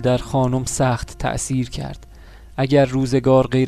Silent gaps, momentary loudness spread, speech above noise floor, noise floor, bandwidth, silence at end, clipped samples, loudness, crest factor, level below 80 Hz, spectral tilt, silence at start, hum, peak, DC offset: none; 15 LU; 23 dB; -41 dBFS; 14 kHz; 0 s; under 0.1%; -19 LUFS; 16 dB; -38 dBFS; -6 dB/octave; 0 s; none; -4 dBFS; under 0.1%